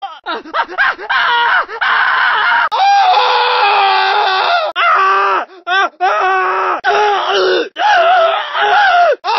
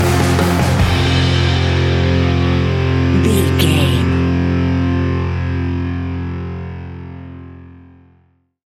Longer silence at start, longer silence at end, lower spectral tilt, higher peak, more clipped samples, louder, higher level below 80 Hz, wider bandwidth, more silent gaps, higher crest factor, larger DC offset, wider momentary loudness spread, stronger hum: about the same, 0 s vs 0 s; second, 0 s vs 0.9 s; second, -1.5 dB/octave vs -6 dB/octave; about the same, 0 dBFS vs 0 dBFS; neither; first, -11 LUFS vs -15 LUFS; second, -60 dBFS vs -28 dBFS; second, 6.2 kHz vs 16 kHz; neither; about the same, 12 dB vs 14 dB; neither; second, 5 LU vs 14 LU; neither